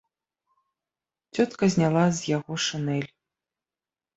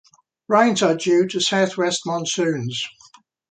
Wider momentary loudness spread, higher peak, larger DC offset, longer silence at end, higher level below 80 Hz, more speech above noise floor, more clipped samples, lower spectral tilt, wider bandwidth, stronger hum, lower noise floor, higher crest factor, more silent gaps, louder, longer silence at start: about the same, 10 LU vs 9 LU; second, -8 dBFS vs -2 dBFS; neither; first, 1.1 s vs 0.6 s; about the same, -64 dBFS vs -68 dBFS; first, over 66 dB vs 33 dB; neither; first, -5.5 dB/octave vs -4 dB/octave; second, 8.2 kHz vs 9.4 kHz; neither; first, under -90 dBFS vs -52 dBFS; about the same, 18 dB vs 18 dB; neither; second, -25 LUFS vs -20 LUFS; first, 1.35 s vs 0.5 s